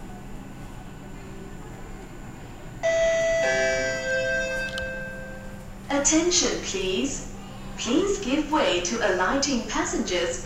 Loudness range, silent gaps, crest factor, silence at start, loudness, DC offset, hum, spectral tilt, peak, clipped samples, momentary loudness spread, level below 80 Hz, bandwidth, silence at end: 3 LU; none; 18 dB; 0 s; -24 LUFS; 0.2%; none; -2.5 dB/octave; -8 dBFS; under 0.1%; 19 LU; -42 dBFS; 16 kHz; 0 s